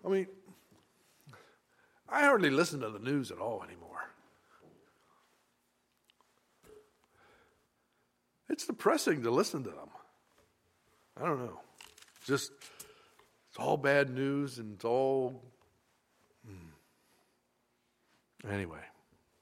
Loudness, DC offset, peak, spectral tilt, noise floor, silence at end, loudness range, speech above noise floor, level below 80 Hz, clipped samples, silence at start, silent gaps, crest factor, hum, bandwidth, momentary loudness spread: -33 LUFS; under 0.1%; -12 dBFS; -5 dB/octave; -77 dBFS; 0.55 s; 15 LU; 45 dB; -76 dBFS; under 0.1%; 0.05 s; none; 26 dB; none; 16 kHz; 25 LU